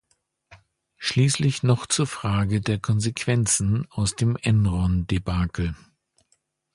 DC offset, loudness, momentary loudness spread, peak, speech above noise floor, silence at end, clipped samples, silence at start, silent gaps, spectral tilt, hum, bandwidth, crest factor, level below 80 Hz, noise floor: under 0.1%; -23 LUFS; 6 LU; -6 dBFS; 47 dB; 1 s; under 0.1%; 0.5 s; none; -5 dB/octave; none; 11.5 kHz; 18 dB; -38 dBFS; -69 dBFS